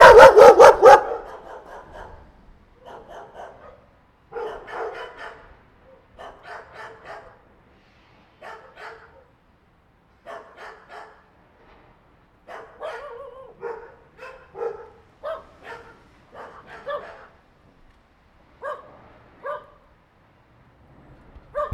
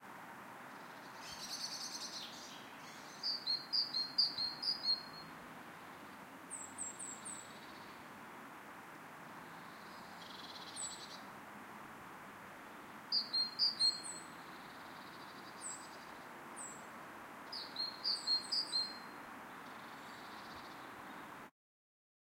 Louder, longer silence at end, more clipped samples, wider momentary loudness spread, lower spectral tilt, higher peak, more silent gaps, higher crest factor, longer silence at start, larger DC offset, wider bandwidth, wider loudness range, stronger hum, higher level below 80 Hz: first, -10 LUFS vs -40 LUFS; second, 0.1 s vs 0.8 s; neither; first, 32 LU vs 18 LU; first, -3.5 dB/octave vs -0.5 dB/octave; first, 0 dBFS vs -22 dBFS; neither; about the same, 20 dB vs 24 dB; about the same, 0 s vs 0 s; neither; about the same, 15 kHz vs 16 kHz; first, 17 LU vs 12 LU; neither; first, -48 dBFS vs -82 dBFS